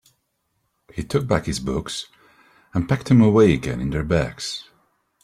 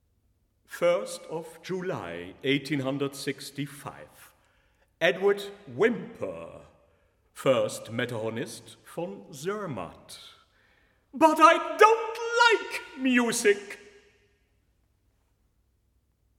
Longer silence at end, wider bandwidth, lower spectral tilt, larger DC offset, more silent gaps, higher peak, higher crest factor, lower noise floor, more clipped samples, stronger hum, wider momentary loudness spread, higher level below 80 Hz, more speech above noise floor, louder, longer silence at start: second, 0.6 s vs 2.6 s; second, 14.5 kHz vs 17.5 kHz; first, -6.5 dB/octave vs -4 dB/octave; neither; neither; about the same, -4 dBFS vs -4 dBFS; second, 18 dB vs 26 dB; about the same, -72 dBFS vs -70 dBFS; neither; neither; second, 17 LU vs 22 LU; first, -42 dBFS vs -70 dBFS; first, 52 dB vs 43 dB; first, -21 LUFS vs -26 LUFS; first, 0.95 s vs 0.7 s